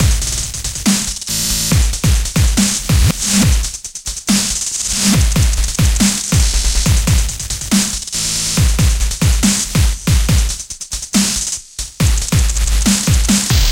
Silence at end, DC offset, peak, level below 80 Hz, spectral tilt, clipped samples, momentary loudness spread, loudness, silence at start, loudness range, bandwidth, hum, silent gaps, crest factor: 0 s; under 0.1%; 0 dBFS; -18 dBFS; -3.5 dB/octave; under 0.1%; 7 LU; -14 LUFS; 0 s; 2 LU; 17 kHz; none; none; 14 dB